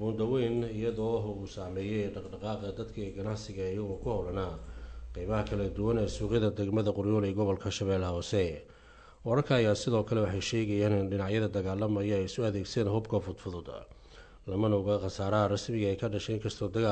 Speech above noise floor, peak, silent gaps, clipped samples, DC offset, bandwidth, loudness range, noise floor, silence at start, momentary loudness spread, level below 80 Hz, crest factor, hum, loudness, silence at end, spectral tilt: 24 dB; -16 dBFS; none; under 0.1%; under 0.1%; 9 kHz; 6 LU; -55 dBFS; 0 s; 11 LU; -50 dBFS; 16 dB; none; -32 LUFS; 0 s; -6.5 dB/octave